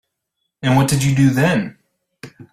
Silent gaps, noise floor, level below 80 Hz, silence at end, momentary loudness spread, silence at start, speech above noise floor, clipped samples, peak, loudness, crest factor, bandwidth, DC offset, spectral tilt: none; -75 dBFS; -46 dBFS; 0.1 s; 9 LU; 0.65 s; 60 dB; under 0.1%; -2 dBFS; -16 LUFS; 16 dB; 15.5 kHz; under 0.1%; -6 dB/octave